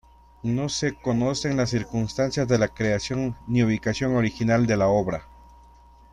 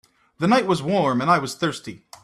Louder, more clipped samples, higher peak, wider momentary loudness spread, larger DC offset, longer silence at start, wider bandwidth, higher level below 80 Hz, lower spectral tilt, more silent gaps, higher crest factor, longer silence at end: second, -24 LUFS vs -21 LUFS; neither; second, -8 dBFS vs -4 dBFS; second, 7 LU vs 10 LU; neither; about the same, 0.45 s vs 0.4 s; second, 10.5 kHz vs 14 kHz; first, -48 dBFS vs -60 dBFS; about the same, -6 dB/octave vs -5.5 dB/octave; neither; about the same, 16 dB vs 18 dB; first, 0.9 s vs 0.25 s